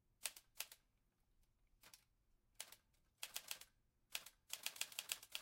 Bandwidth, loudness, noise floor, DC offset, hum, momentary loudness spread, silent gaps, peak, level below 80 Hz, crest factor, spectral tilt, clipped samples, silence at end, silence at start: 17 kHz; -51 LUFS; -82 dBFS; under 0.1%; none; 20 LU; none; -22 dBFS; -82 dBFS; 34 dB; 2.5 dB/octave; under 0.1%; 0 s; 0.2 s